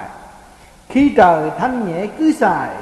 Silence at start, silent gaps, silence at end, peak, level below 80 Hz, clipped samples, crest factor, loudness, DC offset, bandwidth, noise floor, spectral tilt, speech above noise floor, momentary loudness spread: 0 s; none; 0 s; 0 dBFS; -44 dBFS; under 0.1%; 16 dB; -15 LUFS; under 0.1%; 12.5 kHz; -43 dBFS; -6.5 dB/octave; 29 dB; 10 LU